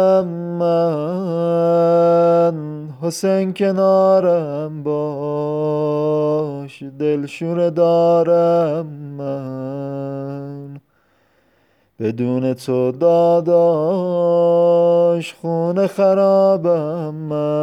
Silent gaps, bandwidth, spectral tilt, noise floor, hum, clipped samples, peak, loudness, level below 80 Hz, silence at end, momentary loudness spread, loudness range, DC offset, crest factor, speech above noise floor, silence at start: none; 12.5 kHz; -8 dB/octave; -60 dBFS; none; under 0.1%; -4 dBFS; -17 LUFS; -70 dBFS; 0 s; 13 LU; 9 LU; under 0.1%; 12 dB; 43 dB; 0 s